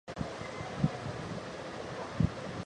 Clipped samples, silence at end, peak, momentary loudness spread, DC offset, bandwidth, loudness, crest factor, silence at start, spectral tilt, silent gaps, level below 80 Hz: under 0.1%; 0 s; -14 dBFS; 7 LU; under 0.1%; 11 kHz; -37 LUFS; 22 dB; 0.05 s; -6.5 dB/octave; none; -50 dBFS